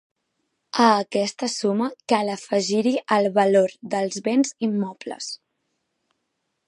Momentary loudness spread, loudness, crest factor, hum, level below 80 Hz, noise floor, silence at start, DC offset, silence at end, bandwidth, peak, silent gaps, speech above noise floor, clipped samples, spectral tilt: 13 LU; -22 LUFS; 20 dB; none; -76 dBFS; -76 dBFS; 0.75 s; under 0.1%; 1.35 s; 11.5 kHz; -2 dBFS; none; 55 dB; under 0.1%; -4.5 dB/octave